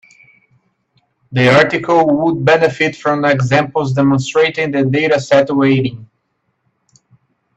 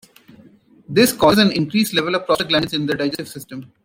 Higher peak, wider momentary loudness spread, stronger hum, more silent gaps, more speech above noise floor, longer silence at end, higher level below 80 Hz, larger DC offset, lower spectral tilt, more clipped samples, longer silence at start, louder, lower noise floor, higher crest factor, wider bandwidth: about the same, 0 dBFS vs -2 dBFS; second, 5 LU vs 16 LU; neither; neither; first, 54 dB vs 31 dB; first, 1.55 s vs 0.2 s; about the same, -52 dBFS vs -52 dBFS; neither; first, -6.5 dB/octave vs -4.5 dB/octave; neither; first, 1.3 s vs 0.9 s; first, -13 LUFS vs -17 LUFS; first, -67 dBFS vs -49 dBFS; about the same, 14 dB vs 18 dB; second, 8.4 kHz vs 16.5 kHz